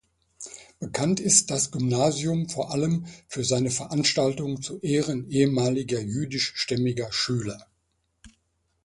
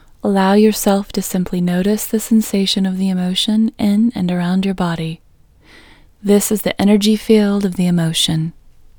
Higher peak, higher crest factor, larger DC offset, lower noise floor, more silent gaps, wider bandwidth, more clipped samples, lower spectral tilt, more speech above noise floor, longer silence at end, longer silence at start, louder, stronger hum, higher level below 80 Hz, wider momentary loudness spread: second, -4 dBFS vs 0 dBFS; first, 22 dB vs 16 dB; neither; first, -73 dBFS vs -48 dBFS; neither; second, 11.5 kHz vs over 20 kHz; neither; second, -4 dB/octave vs -5.5 dB/octave; first, 48 dB vs 33 dB; about the same, 0.55 s vs 0.5 s; first, 0.4 s vs 0.25 s; second, -25 LUFS vs -16 LUFS; neither; second, -58 dBFS vs -44 dBFS; first, 14 LU vs 7 LU